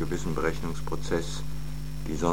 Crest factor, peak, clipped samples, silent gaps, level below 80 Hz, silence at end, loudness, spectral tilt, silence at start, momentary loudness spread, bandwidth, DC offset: 22 dB; -10 dBFS; under 0.1%; none; -38 dBFS; 0 s; -32 LUFS; -5.5 dB/octave; 0 s; 8 LU; 17 kHz; 3%